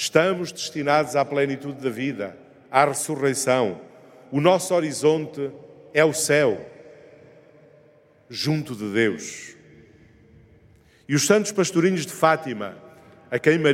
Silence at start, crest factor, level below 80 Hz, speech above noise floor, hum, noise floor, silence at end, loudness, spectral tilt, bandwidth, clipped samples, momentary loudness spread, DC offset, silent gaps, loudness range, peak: 0 s; 22 dB; -68 dBFS; 34 dB; none; -55 dBFS; 0 s; -22 LUFS; -4.5 dB/octave; 16.5 kHz; under 0.1%; 14 LU; under 0.1%; none; 7 LU; 0 dBFS